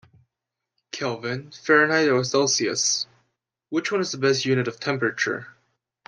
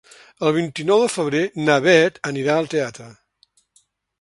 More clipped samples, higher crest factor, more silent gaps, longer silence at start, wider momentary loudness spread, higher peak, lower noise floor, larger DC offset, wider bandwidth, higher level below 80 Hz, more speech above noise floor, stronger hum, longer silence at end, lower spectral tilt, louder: neither; about the same, 20 dB vs 20 dB; neither; first, 0.95 s vs 0.4 s; first, 12 LU vs 9 LU; second, -4 dBFS vs 0 dBFS; first, -85 dBFS vs -62 dBFS; neither; about the same, 10.5 kHz vs 11.5 kHz; second, -70 dBFS vs -64 dBFS; first, 62 dB vs 43 dB; neither; second, 0.6 s vs 1.1 s; second, -3 dB/octave vs -5 dB/octave; second, -23 LUFS vs -19 LUFS